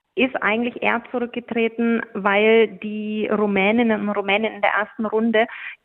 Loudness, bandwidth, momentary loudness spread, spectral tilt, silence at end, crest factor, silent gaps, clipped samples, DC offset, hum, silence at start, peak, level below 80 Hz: -20 LUFS; 4 kHz; 8 LU; -8.5 dB/octave; 0.1 s; 18 dB; none; under 0.1%; under 0.1%; none; 0.15 s; -2 dBFS; -64 dBFS